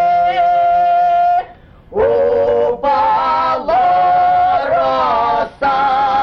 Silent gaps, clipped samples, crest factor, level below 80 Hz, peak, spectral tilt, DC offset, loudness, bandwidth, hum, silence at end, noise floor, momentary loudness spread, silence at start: none; under 0.1%; 8 dB; -44 dBFS; -4 dBFS; -6 dB/octave; under 0.1%; -13 LUFS; 6.2 kHz; none; 0 s; -38 dBFS; 4 LU; 0 s